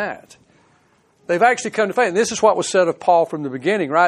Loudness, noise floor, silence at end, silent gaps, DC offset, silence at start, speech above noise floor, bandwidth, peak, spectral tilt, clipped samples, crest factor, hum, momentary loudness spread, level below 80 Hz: -18 LUFS; -58 dBFS; 0 s; none; under 0.1%; 0 s; 40 dB; 12.5 kHz; -2 dBFS; -4 dB/octave; under 0.1%; 16 dB; none; 7 LU; -64 dBFS